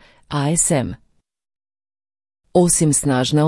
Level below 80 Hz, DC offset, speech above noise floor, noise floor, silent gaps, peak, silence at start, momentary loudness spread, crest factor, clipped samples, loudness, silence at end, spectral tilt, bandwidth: -46 dBFS; under 0.1%; over 74 dB; under -90 dBFS; none; -2 dBFS; 0.3 s; 10 LU; 16 dB; under 0.1%; -17 LUFS; 0 s; -4.5 dB/octave; 12 kHz